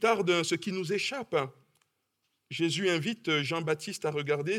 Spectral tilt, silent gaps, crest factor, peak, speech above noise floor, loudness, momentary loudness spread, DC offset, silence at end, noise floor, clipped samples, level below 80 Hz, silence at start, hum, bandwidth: -4.5 dB/octave; none; 20 dB; -12 dBFS; 49 dB; -30 LUFS; 6 LU; under 0.1%; 0 s; -79 dBFS; under 0.1%; -78 dBFS; 0 s; none; 16 kHz